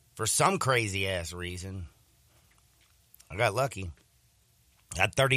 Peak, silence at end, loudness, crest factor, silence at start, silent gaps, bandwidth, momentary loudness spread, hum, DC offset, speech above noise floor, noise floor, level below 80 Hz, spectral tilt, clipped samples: -8 dBFS; 0 s; -29 LUFS; 24 dB; 0.15 s; none; 15.5 kHz; 18 LU; none; under 0.1%; 37 dB; -66 dBFS; -58 dBFS; -3.5 dB/octave; under 0.1%